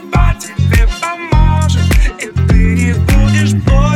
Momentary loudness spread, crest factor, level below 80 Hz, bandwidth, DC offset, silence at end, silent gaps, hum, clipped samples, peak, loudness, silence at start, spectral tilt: 5 LU; 10 dB; -14 dBFS; 14 kHz; under 0.1%; 0 s; none; none; under 0.1%; 0 dBFS; -12 LUFS; 0 s; -6 dB/octave